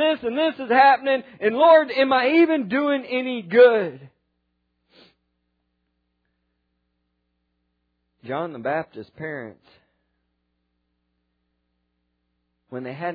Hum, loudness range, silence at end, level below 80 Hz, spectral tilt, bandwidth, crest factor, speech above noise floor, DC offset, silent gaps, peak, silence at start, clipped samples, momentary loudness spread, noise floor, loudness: 60 Hz at -70 dBFS; 22 LU; 0 s; -70 dBFS; -8 dB/octave; 5 kHz; 20 dB; 54 dB; under 0.1%; none; -4 dBFS; 0 s; under 0.1%; 20 LU; -74 dBFS; -19 LUFS